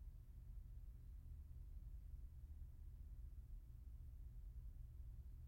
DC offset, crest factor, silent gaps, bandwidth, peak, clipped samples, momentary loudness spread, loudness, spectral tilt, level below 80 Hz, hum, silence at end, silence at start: under 0.1%; 10 dB; none; 16.5 kHz; -46 dBFS; under 0.1%; 2 LU; -60 LUFS; -8 dB/octave; -56 dBFS; none; 0 s; 0 s